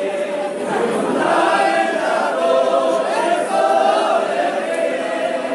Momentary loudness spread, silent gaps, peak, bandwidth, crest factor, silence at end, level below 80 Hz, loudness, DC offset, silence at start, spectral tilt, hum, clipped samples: 6 LU; none; -4 dBFS; 11.5 kHz; 14 dB; 0 s; -74 dBFS; -17 LUFS; under 0.1%; 0 s; -3.5 dB/octave; none; under 0.1%